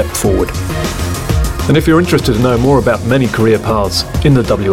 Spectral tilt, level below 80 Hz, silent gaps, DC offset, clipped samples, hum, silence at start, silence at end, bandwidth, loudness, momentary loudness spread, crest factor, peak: -6 dB/octave; -22 dBFS; none; 0.6%; under 0.1%; none; 0 s; 0 s; 17 kHz; -12 LUFS; 7 LU; 10 dB; 0 dBFS